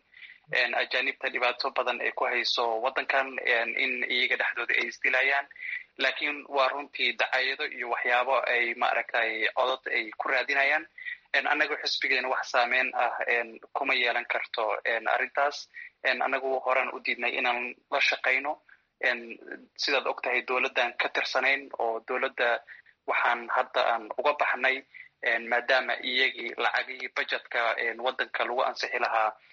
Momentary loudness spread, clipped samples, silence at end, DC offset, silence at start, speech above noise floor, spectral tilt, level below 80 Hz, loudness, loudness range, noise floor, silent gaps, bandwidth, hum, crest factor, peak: 6 LU; under 0.1%; 0.2 s; under 0.1%; 0.2 s; 23 dB; 3 dB/octave; -80 dBFS; -27 LUFS; 2 LU; -52 dBFS; none; 7.6 kHz; none; 18 dB; -10 dBFS